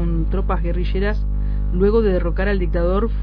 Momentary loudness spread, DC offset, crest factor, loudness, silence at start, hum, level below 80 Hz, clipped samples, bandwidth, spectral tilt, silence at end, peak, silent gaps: 6 LU; under 0.1%; 12 dB; -20 LUFS; 0 s; 50 Hz at -20 dBFS; -20 dBFS; under 0.1%; 4.9 kHz; -10.5 dB/octave; 0 s; -6 dBFS; none